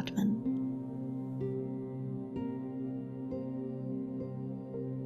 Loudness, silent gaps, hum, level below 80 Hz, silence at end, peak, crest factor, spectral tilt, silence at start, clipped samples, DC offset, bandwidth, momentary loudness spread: -38 LUFS; none; none; -68 dBFS; 0 s; -20 dBFS; 16 dB; -8.5 dB/octave; 0 s; under 0.1%; under 0.1%; 13.5 kHz; 7 LU